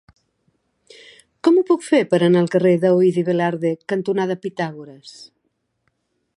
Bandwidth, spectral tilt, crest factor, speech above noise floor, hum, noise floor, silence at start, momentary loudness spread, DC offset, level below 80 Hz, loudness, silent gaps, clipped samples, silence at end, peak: 11 kHz; -7 dB/octave; 16 dB; 53 dB; none; -71 dBFS; 1.45 s; 13 LU; under 0.1%; -68 dBFS; -18 LUFS; none; under 0.1%; 1.25 s; -4 dBFS